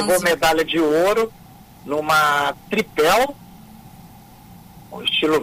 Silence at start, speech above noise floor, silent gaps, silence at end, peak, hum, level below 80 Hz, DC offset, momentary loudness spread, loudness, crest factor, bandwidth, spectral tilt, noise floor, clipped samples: 0 s; 25 dB; none; 0 s; -6 dBFS; none; -50 dBFS; under 0.1%; 9 LU; -18 LUFS; 14 dB; 16 kHz; -3 dB/octave; -44 dBFS; under 0.1%